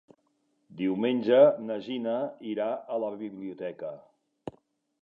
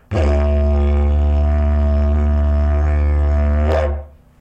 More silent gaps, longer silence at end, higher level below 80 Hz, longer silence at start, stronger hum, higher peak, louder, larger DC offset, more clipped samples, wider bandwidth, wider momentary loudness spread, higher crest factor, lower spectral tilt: neither; first, 0.55 s vs 0.3 s; second, -76 dBFS vs -16 dBFS; first, 0.7 s vs 0.1 s; neither; second, -8 dBFS vs -4 dBFS; second, -28 LUFS vs -17 LUFS; neither; neither; about the same, 5.2 kHz vs 5.4 kHz; first, 24 LU vs 1 LU; first, 22 dB vs 12 dB; about the same, -8.5 dB/octave vs -9 dB/octave